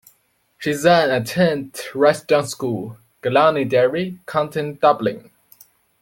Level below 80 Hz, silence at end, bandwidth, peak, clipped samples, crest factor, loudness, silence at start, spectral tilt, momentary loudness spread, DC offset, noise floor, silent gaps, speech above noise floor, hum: -60 dBFS; 0.8 s; 17 kHz; -2 dBFS; under 0.1%; 18 dB; -19 LUFS; 0.6 s; -5 dB/octave; 12 LU; under 0.1%; -62 dBFS; none; 44 dB; none